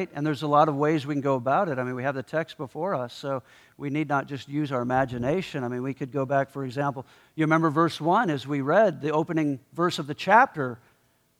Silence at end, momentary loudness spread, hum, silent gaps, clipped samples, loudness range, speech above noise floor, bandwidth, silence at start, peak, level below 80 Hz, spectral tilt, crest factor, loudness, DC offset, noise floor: 0.65 s; 11 LU; none; none; under 0.1%; 5 LU; 40 dB; 14.5 kHz; 0 s; -4 dBFS; -64 dBFS; -7 dB/octave; 20 dB; -26 LUFS; under 0.1%; -66 dBFS